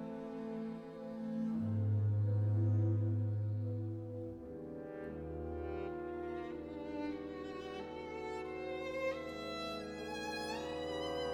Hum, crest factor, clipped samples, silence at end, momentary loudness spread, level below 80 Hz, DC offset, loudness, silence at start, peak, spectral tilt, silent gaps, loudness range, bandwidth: none; 14 dB; under 0.1%; 0 s; 11 LU; -60 dBFS; under 0.1%; -40 LUFS; 0 s; -26 dBFS; -7.5 dB/octave; none; 8 LU; 9.8 kHz